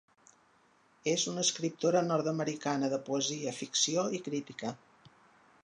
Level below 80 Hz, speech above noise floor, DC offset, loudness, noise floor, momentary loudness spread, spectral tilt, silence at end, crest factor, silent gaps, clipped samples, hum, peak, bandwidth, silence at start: -82 dBFS; 34 dB; under 0.1%; -32 LUFS; -67 dBFS; 10 LU; -3.5 dB/octave; 0.55 s; 18 dB; none; under 0.1%; none; -16 dBFS; 11 kHz; 1.05 s